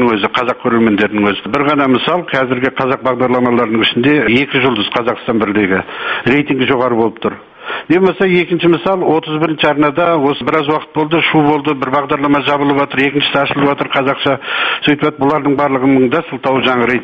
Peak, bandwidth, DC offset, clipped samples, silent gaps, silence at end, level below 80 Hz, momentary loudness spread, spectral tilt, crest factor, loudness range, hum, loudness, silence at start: 0 dBFS; 6.8 kHz; under 0.1%; under 0.1%; none; 0 s; -48 dBFS; 4 LU; -7.5 dB/octave; 12 dB; 1 LU; none; -13 LUFS; 0 s